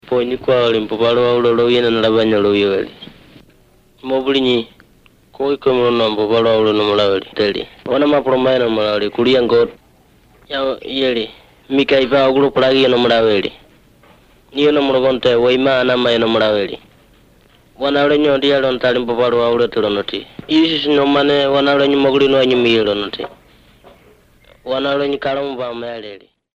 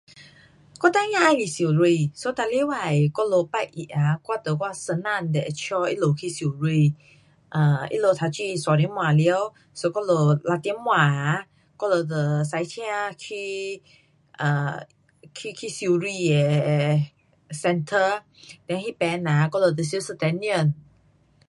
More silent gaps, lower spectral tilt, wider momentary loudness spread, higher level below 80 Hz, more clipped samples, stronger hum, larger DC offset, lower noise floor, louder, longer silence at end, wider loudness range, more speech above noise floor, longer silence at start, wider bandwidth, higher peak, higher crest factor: neither; about the same, -6 dB/octave vs -6 dB/octave; about the same, 11 LU vs 11 LU; first, -48 dBFS vs -66 dBFS; neither; neither; neither; second, -51 dBFS vs -60 dBFS; first, -15 LUFS vs -23 LUFS; second, 0.35 s vs 0.7 s; about the same, 4 LU vs 5 LU; about the same, 36 dB vs 37 dB; about the same, 0.05 s vs 0.15 s; second, 8 kHz vs 11.5 kHz; about the same, -2 dBFS vs -4 dBFS; second, 14 dB vs 20 dB